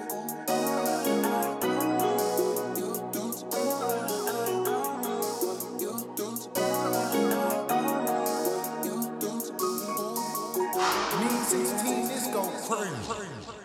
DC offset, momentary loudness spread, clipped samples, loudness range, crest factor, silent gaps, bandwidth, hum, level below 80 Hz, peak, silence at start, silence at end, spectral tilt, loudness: under 0.1%; 7 LU; under 0.1%; 2 LU; 16 dB; none; over 20 kHz; none; -68 dBFS; -14 dBFS; 0 s; 0 s; -3.5 dB/octave; -29 LUFS